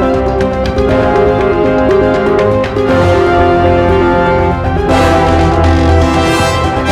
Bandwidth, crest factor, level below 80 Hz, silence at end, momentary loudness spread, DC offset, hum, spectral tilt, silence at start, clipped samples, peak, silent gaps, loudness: 13.5 kHz; 8 dB; -20 dBFS; 0 s; 4 LU; under 0.1%; none; -6.5 dB/octave; 0 s; under 0.1%; 0 dBFS; none; -10 LUFS